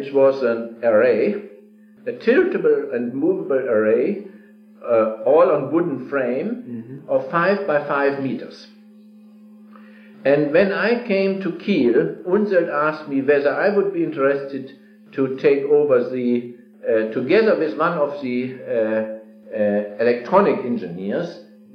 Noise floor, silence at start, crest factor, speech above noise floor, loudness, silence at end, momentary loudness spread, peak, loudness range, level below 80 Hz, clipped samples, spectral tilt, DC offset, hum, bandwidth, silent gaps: -47 dBFS; 0 s; 18 dB; 28 dB; -19 LUFS; 0.3 s; 13 LU; -2 dBFS; 3 LU; -66 dBFS; under 0.1%; -8.5 dB/octave; under 0.1%; none; 6.2 kHz; none